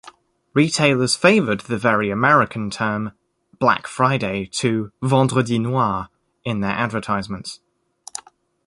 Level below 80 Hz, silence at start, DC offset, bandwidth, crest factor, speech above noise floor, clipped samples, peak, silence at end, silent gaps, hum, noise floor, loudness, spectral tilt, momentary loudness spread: -52 dBFS; 0.05 s; under 0.1%; 11.5 kHz; 18 dB; 29 dB; under 0.1%; -2 dBFS; 0.45 s; none; none; -48 dBFS; -19 LUFS; -5 dB/octave; 16 LU